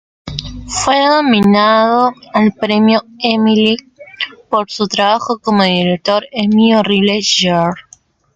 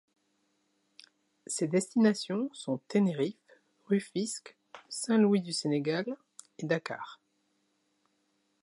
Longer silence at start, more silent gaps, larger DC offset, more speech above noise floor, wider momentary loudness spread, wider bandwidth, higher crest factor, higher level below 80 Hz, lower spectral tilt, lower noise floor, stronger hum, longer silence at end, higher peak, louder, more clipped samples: second, 0.25 s vs 1.5 s; neither; neither; second, 35 dB vs 46 dB; second, 12 LU vs 16 LU; second, 9.4 kHz vs 11.5 kHz; second, 12 dB vs 20 dB; first, -44 dBFS vs -84 dBFS; about the same, -4.5 dB/octave vs -5 dB/octave; second, -47 dBFS vs -76 dBFS; neither; second, 0.55 s vs 1.5 s; first, 0 dBFS vs -14 dBFS; first, -12 LUFS vs -31 LUFS; neither